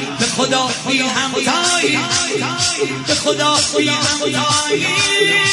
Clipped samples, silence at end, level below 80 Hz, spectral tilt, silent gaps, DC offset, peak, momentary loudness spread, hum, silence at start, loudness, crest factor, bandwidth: under 0.1%; 0 s; -54 dBFS; -2 dB/octave; none; under 0.1%; -2 dBFS; 3 LU; none; 0 s; -15 LUFS; 14 dB; 11.5 kHz